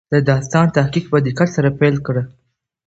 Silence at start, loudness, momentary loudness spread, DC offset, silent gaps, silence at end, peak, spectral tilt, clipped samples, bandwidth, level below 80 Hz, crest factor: 0.1 s; -16 LUFS; 7 LU; under 0.1%; none; 0.6 s; 0 dBFS; -7 dB/octave; under 0.1%; 8 kHz; -48 dBFS; 16 dB